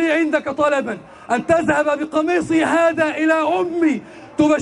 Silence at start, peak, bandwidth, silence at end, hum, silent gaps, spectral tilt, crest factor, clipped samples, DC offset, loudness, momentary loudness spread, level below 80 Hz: 0 s; -4 dBFS; 11 kHz; 0 s; none; none; -5 dB/octave; 14 dB; under 0.1%; under 0.1%; -18 LUFS; 7 LU; -54 dBFS